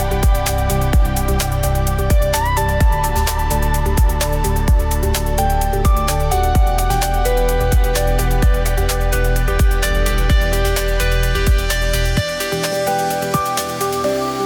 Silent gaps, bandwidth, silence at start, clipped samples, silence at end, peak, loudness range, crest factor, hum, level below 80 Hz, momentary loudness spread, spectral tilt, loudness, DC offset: none; 18 kHz; 0 s; under 0.1%; 0 s; -4 dBFS; 1 LU; 10 dB; none; -18 dBFS; 2 LU; -4.5 dB/octave; -17 LUFS; under 0.1%